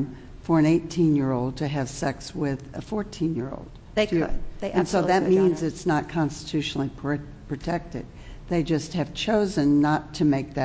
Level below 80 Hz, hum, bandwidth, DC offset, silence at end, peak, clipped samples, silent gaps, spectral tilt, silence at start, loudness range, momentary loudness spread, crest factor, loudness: -44 dBFS; none; 8 kHz; under 0.1%; 0 s; -8 dBFS; under 0.1%; none; -6.5 dB/octave; 0 s; 4 LU; 13 LU; 18 dB; -25 LUFS